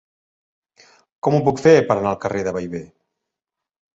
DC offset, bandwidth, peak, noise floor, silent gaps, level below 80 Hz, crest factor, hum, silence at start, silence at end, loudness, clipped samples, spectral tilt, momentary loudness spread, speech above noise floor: under 0.1%; 7.8 kHz; -2 dBFS; -85 dBFS; none; -54 dBFS; 20 dB; none; 1.25 s; 1.1 s; -18 LUFS; under 0.1%; -6.5 dB/octave; 14 LU; 67 dB